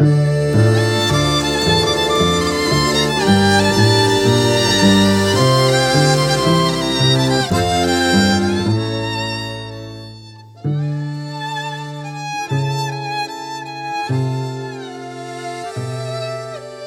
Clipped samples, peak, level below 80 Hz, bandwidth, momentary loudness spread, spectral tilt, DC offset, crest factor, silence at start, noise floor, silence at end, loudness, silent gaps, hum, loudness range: under 0.1%; -2 dBFS; -40 dBFS; 17 kHz; 15 LU; -5 dB/octave; under 0.1%; 16 dB; 0 s; -38 dBFS; 0 s; -16 LUFS; none; none; 11 LU